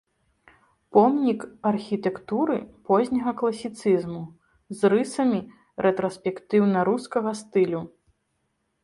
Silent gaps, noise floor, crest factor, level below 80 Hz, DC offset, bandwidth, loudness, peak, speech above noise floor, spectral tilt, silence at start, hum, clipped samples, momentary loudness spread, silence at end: none; -74 dBFS; 20 dB; -64 dBFS; under 0.1%; 11.5 kHz; -24 LUFS; -4 dBFS; 51 dB; -7 dB/octave; 0.95 s; none; under 0.1%; 11 LU; 0.95 s